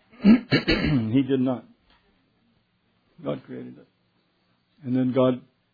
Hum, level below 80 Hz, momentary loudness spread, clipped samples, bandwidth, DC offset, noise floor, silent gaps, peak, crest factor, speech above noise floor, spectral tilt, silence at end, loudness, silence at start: none; -46 dBFS; 20 LU; under 0.1%; 5 kHz; under 0.1%; -68 dBFS; none; -6 dBFS; 20 dB; 46 dB; -8.5 dB/octave; 0.35 s; -23 LUFS; 0.2 s